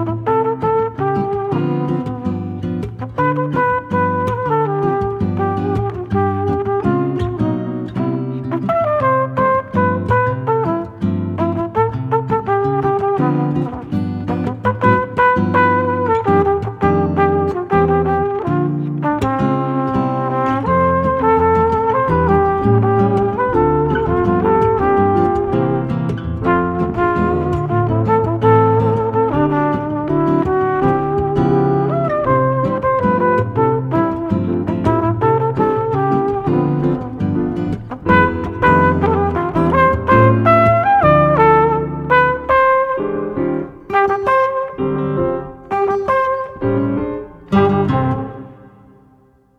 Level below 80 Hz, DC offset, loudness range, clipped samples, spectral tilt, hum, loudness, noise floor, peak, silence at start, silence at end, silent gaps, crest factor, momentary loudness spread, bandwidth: -36 dBFS; under 0.1%; 5 LU; under 0.1%; -9.5 dB/octave; none; -16 LUFS; -51 dBFS; 0 dBFS; 0 s; 0.9 s; none; 16 dB; 8 LU; 7.4 kHz